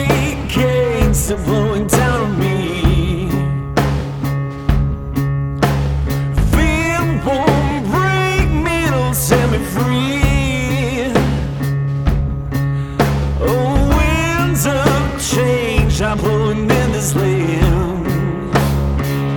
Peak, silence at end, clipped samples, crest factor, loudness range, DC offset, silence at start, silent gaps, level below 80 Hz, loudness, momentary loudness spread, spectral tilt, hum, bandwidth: 0 dBFS; 0 s; under 0.1%; 14 dB; 2 LU; under 0.1%; 0 s; none; -22 dBFS; -16 LUFS; 4 LU; -5.5 dB/octave; none; 19 kHz